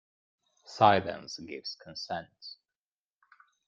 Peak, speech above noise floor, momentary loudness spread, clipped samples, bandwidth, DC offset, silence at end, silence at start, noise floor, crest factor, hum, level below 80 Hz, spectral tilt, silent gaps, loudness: -6 dBFS; over 60 dB; 23 LU; under 0.1%; 7.6 kHz; under 0.1%; 1.15 s; 0.7 s; under -90 dBFS; 26 dB; none; -72 dBFS; -5 dB/octave; none; -30 LUFS